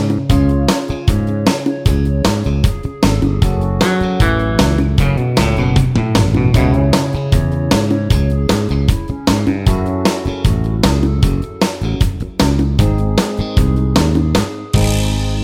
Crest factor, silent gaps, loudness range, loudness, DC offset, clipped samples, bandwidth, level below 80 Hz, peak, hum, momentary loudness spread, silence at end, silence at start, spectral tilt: 14 dB; none; 2 LU; -15 LUFS; under 0.1%; under 0.1%; 16.5 kHz; -20 dBFS; 0 dBFS; none; 4 LU; 0 s; 0 s; -6 dB/octave